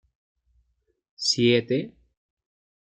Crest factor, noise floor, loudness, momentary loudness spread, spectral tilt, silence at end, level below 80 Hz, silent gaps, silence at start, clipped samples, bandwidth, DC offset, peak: 20 dB; -72 dBFS; -23 LUFS; 10 LU; -4 dB/octave; 1.05 s; -68 dBFS; none; 1.2 s; under 0.1%; 9.4 kHz; under 0.1%; -8 dBFS